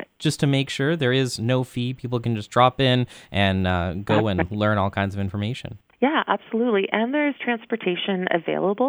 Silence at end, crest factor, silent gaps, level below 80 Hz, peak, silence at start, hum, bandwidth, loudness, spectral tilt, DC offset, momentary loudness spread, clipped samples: 0 s; 18 dB; none; -50 dBFS; -4 dBFS; 0 s; none; over 20 kHz; -23 LUFS; -6 dB/octave; under 0.1%; 6 LU; under 0.1%